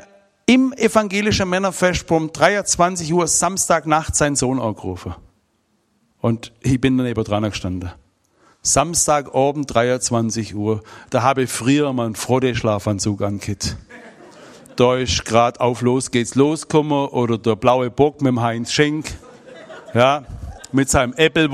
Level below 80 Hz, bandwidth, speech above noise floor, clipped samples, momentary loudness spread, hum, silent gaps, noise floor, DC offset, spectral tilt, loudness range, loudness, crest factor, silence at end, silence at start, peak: -42 dBFS; 15 kHz; 47 dB; under 0.1%; 9 LU; none; none; -65 dBFS; under 0.1%; -4.5 dB/octave; 4 LU; -18 LUFS; 18 dB; 0 s; 0.5 s; 0 dBFS